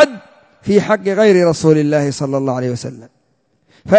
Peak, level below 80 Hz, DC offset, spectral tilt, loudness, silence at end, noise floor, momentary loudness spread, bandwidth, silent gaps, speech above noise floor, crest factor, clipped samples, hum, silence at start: 0 dBFS; -50 dBFS; under 0.1%; -6 dB/octave; -14 LUFS; 0 s; -62 dBFS; 15 LU; 8 kHz; none; 48 dB; 14 dB; under 0.1%; none; 0 s